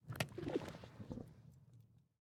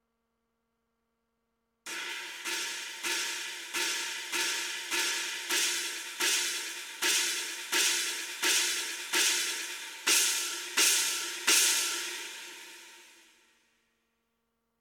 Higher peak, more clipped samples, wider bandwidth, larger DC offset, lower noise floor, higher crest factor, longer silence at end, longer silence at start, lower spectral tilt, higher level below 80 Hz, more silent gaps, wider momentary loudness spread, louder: second, -22 dBFS vs -10 dBFS; neither; about the same, 17.5 kHz vs 19 kHz; neither; second, -67 dBFS vs -81 dBFS; about the same, 26 dB vs 22 dB; second, 0.2 s vs 1.7 s; second, 0.05 s vs 1.85 s; first, -5.5 dB/octave vs 3 dB/octave; first, -68 dBFS vs -88 dBFS; neither; first, 22 LU vs 13 LU; second, -47 LUFS vs -28 LUFS